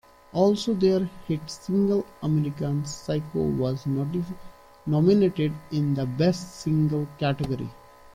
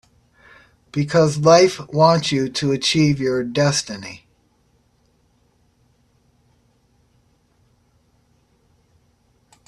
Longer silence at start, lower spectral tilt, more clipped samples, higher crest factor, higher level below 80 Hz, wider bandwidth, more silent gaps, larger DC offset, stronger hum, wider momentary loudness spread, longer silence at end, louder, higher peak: second, 0.35 s vs 0.95 s; first, -7.5 dB/octave vs -5 dB/octave; neither; about the same, 16 dB vs 20 dB; about the same, -52 dBFS vs -56 dBFS; first, 14.5 kHz vs 12 kHz; neither; neither; neither; second, 9 LU vs 17 LU; second, 0.4 s vs 5.5 s; second, -25 LUFS vs -17 LUFS; second, -8 dBFS vs 0 dBFS